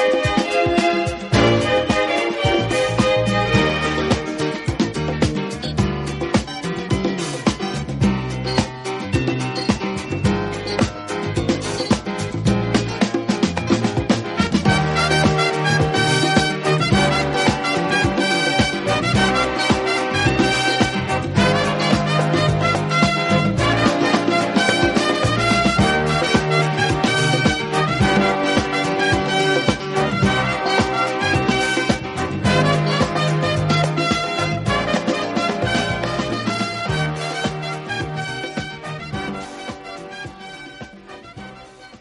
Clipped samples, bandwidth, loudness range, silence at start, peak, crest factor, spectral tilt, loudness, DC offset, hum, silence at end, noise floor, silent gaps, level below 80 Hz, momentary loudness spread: under 0.1%; 11.5 kHz; 5 LU; 0 s; -2 dBFS; 18 dB; -5 dB/octave; -19 LUFS; under 0.1%; none; 0.05 s; -41 dBFS; none; -38 dBFS; 9 LU